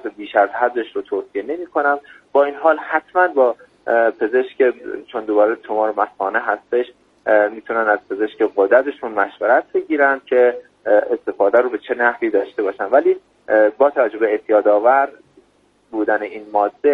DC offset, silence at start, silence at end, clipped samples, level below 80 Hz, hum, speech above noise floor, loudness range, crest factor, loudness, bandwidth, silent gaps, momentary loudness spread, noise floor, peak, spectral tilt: under 0.1%; 0.05 s; 0 s; under 0.1%; -66 dBFS; none; 40 dB; 2 LU; 18 dB; -18 LUFS; 4.6 kHz; none; 9 LU; -58 dBFS; 0 dBFS; -6.5 dB/octave